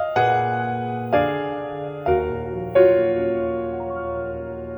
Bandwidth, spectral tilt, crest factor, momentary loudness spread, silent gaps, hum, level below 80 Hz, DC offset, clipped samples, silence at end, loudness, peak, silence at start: over 20 kHz; -8.5 dB/octave; 18 dB; 12 LU; none; none; -44 dBFS; under 0.1%; under 0.1%; 0 s; -22 LUFS; -4 dBFS; 0 s